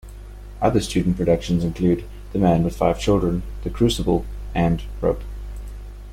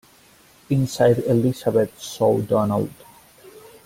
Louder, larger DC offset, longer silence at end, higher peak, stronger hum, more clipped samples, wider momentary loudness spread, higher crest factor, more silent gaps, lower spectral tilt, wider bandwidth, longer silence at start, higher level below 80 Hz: about the same, -22 LUFS vs -21 LUFS; neither; second, 0 s vs 0.25 s; about the same, -4 dBFS vs -4 dBFS; first, 50 Hz at -30 dBFS vs none; neither; first, 17 LU vs 7 LU; about the same, 18 dB vs 18 dB; neither; about the same, -7 dB/octave vs -7 dB/octave; second, 14.5 kHz vs 16.5 kHz; second, 0.05 s vs 0.7 s; first, -32 dBFS vs -54 dBFS